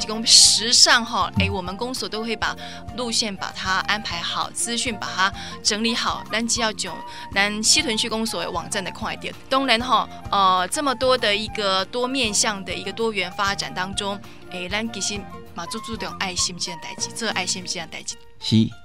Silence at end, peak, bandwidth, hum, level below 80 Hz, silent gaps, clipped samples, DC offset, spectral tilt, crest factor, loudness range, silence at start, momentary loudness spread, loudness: 0.1 s; 0 dBFS; 16 kHz; none; -48 dBFS; none; under 0.1%; 0.8%; -2 dB/octave; 22 dB; 6 LU; 0 s; 14 LU; -21 LUFS